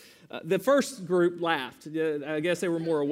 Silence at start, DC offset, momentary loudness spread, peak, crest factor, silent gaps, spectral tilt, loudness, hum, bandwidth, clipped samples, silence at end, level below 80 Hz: 0.35 s; under 0.1%; 8 LU; -10 dBFS; 18 dB; none; -5 dB/octave; -28 LUFS; none; 16 kHz; under 0.1%; 0 s; -76 dBFS